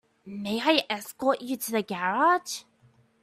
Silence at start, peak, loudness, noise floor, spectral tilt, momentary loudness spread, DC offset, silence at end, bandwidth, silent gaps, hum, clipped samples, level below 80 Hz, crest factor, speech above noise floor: 0.25 s; -6 dBFS; -27 LUFS; -62 dBFS; -3 dB/octave; 13 LU; under 0.1%; 0.6 s; 15.5 kHz; none; none; under 0.1%; -72 dBFS; 22 dB; 35 dB